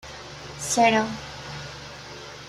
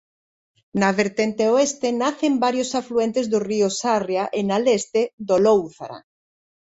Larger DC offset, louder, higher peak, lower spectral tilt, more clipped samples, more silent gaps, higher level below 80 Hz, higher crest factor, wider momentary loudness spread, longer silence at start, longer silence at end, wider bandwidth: neither; second, -24 LUFS vs -21 LUFS; about the same, -6 dBFS vs -4 dBFS; second, -3 dB/octave vs -4.5 dB/octave; neither; second, none vs 5.13-5.18 s; first, -54 dBFS vs -62 dBFS; about the same, 22 dB vs 18 dB; first, 19 LU vs 5 LU; second, 0.05 s vs 0.75 s; second, 0 s vs 0.65 s; first, 14 kHz vs 8.2 kHz